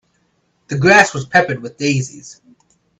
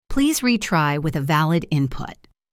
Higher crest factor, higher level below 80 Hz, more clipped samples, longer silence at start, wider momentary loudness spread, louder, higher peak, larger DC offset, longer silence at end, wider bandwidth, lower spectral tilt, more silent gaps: about the same, 18 dB vs 14 dB; second, -54 dBFS vs -38 dBFS; neither; first, 0.7 s vs 0.1 s; first, 14 LU vs 8 LU; first, -14 LUFS vs -20 LUFS; first, 0 dBFS vs -6 dBFS; neither; first, 0.65 s vs 0.4 s; second, 10.5 kHz vs 16.5 kHz; about the same, -4.5 dB/octave vs -5 dB/octave; neither